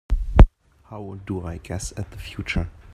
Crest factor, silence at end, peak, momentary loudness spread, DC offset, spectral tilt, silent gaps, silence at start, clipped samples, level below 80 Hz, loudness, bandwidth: 22 dB; 0.25 s; 0 dBFS; 19 LU; under 0.1%; -6.5 dB/octave; none; 0.1 s; under 0.1%; -22 dBFS; -24 LUFS; 11 kHz